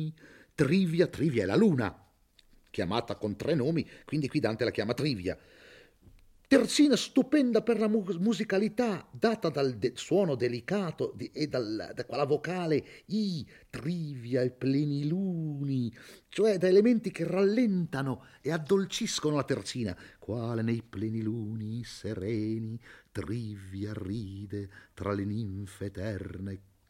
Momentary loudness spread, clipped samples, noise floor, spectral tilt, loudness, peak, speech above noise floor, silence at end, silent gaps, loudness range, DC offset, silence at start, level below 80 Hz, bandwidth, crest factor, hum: 13 LU; under 0.1%; -63 dBFS; -6 dB/octave; -30 LUFS; -10 dBFS; 33 dB; 0.3 s; none; 9 LU; under 0.1%; 0 s; -64 dBFS; 16 kHz; 20 dB; none